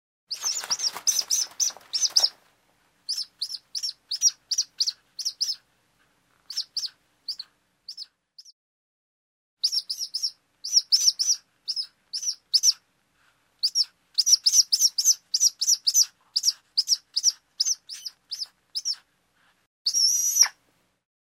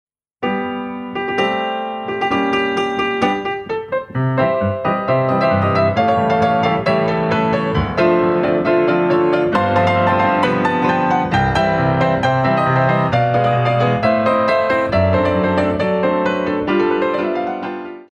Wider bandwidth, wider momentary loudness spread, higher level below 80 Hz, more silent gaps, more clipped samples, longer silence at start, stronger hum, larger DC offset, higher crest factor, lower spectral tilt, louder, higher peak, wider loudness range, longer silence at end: first, 16 kHz vs 9.4 kHz; first, 16 LU vs 7 LU; second, -84 dBFS vs -42 dBFS; first, 8.52-9.57 s, 19.66-19.85 s vs none; neither; about the same, 0.3 s vs 0.4 s; neither; neither; first, 22 dB vs 14 dB; second, 5.5 dB/octave vs -7.5 dB/octave; second, -23 LUFS vs -16 LUFS; about the same, -4 dBFS vs -2 dBFS; first, 13 LU vs 4 LU; first, 0.75 s vs 0.05 s